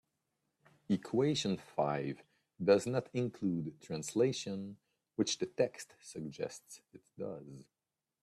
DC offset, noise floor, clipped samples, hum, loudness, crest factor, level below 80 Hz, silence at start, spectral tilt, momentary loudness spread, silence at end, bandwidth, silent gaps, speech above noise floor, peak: under 0.1%; under -90 dBFS; under 0.1%; none; -36 LUFS; 22 dB; -76 dBFS; 0.9 s; -5 dB/octave; 19 LU; 0.6 s; 13.5 kHz; none; over 54 dB; -16 dBFS